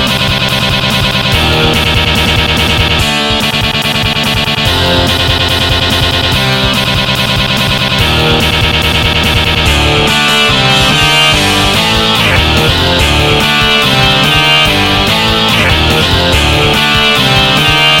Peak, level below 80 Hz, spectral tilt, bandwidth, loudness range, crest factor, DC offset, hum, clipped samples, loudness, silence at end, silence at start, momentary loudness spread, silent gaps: 0 dBFS; -20 dBFS; -3.5 dB/octave; 17.5 kHz; 2 LU; 10 dB; 0.4%; none; 0.2%; -8 LUFS; 0 s; 0 s; 3 LU; none